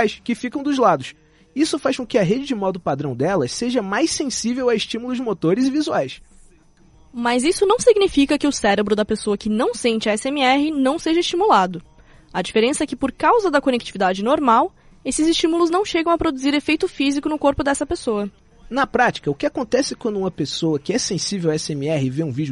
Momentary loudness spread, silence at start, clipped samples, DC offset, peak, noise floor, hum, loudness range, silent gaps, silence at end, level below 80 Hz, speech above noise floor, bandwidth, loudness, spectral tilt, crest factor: 8 LU; 0 s; under 0.1%; under 0.1%; -2 dBFS; -51 dBFS; none; 3 LU; none; 0 s; -48 dBFS; 32 dB; 11.5 kHz; -20 LUFS; -4.5 dB/octave; 18 dB